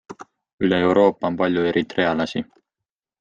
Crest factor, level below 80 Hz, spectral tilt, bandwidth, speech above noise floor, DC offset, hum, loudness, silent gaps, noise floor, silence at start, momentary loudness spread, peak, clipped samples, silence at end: 18 dB; -58 dBFS; -7 dB/octave; 7.6 kHz; 67 dB; under 0.1%; none; -20 LUFS; 0.53-0.58 s; -87 dBFS; 0.1 s; 19 LU; -4 dBFS; under 0.1%; 0.8 s